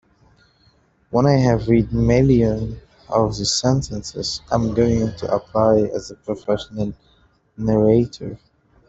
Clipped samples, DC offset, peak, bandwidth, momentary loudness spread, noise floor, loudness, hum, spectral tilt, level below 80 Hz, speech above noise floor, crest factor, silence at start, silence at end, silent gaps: under 0.1%; under 0.1%; -2 dBFS; 8.2 kHz; 13 LU; -58 dBFS; -19 LUFS; none; -6 dB/octave; -38 dBFS; 40 dB; 18 dB; 1.1 s; 0.5 s; none